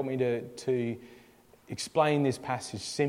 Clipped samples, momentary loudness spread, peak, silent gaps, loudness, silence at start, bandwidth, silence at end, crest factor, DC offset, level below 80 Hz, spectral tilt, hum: under 0.1%; 11 LU; -12 dBFS; none; -30 LUFS; 0 s; 16 kHz; 0 s; 18 dB; under 0.1%; -68 dBFS; -5.5 dB/octave; none